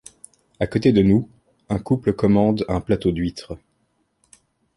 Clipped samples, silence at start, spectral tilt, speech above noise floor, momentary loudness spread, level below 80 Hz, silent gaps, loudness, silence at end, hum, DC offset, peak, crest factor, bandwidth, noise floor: under 0.1%; 0.6 s; -8 dB/octave; 49 dB; 18 LU; -42 dBFS; none; -20 LUFS; 1.2 s; none; under 0.1%; -4 dBFS; 18 dB; 11.5 kHz; -68 dBFS